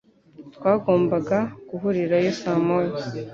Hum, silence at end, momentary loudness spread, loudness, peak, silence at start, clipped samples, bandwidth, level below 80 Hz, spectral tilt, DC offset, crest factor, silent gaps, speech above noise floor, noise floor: none; 0 s; 8 LU; -23 LUFS; -6 dBFS; 0.4 s; under 0.1%; 7.4 kHz; -60 dBFS; -7.5 dB/octave; under 0.1%; 18 dB; none; 24 dB; -46 dBFS